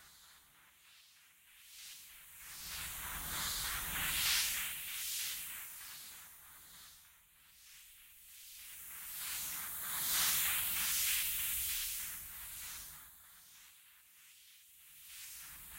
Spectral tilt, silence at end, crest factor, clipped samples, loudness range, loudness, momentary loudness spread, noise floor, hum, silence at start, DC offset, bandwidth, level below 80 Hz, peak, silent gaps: 1 dB/octave; 0 s; 22 dB; under 0.1%; 16 LU; -36 LUFS; 25 LU; -65 dBFS; none; 0 s; under 0.1%; 16 kHz; -62 dBFS; -20 dBFS; none